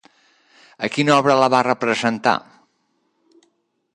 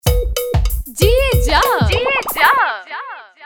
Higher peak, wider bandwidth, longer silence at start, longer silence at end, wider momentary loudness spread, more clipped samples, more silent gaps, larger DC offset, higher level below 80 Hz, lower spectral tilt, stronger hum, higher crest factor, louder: about the same, -2 dBFS vs 0 dBFS; second, 11 kHz vs 20 kHz; first, 0.8 s vs 0.05 s; first, 1.55 s vs 0 s; second, 10 LU vs 13 LU; neither; neither; neither; second, -66 dBFS vs -20 dBFS; about the same, -5 dB/octave vs -4 dB/octave; neither; about the same, 20 dB vs 16 dB; second, -18 LUFS vs -15 LUFS